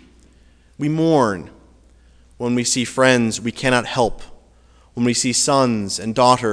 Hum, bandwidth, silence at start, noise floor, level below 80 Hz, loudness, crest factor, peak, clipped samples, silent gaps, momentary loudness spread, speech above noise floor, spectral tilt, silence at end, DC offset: none; 11 kHz; 0.8 s; -51 dBFS; -46 dBFS; -18 LUFS; 20 dB; 0 dBFS; under 0.1%; none; 8 LU; 33 dB; -4 dB/octave; 0 s; under 0.1%